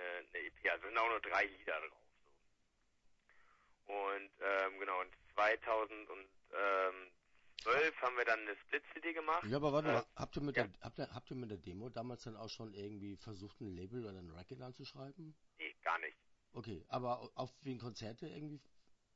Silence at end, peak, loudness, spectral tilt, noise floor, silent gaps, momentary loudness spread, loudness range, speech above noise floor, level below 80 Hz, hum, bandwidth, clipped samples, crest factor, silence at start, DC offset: 0.25 s; -22 dBFS; -41 LUFS; -3 dB/octave; -78 dBFS; none; 17 LU; 11 LU; 36 dB; -70 dBFS; none; 7.6 kHz; under 0.1%; 22 dB; 0 s; under 0.1%